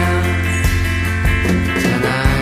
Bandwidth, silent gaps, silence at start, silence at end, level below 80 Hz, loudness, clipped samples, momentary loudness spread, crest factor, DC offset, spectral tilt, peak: 15.5 kHz; none; 0 s; 0 s; -22 dBFS; -16 LUFS; under 0.1%; 2 LU; 14 dB; under 0.1%; -5.5 dB/octave; -2 dBFS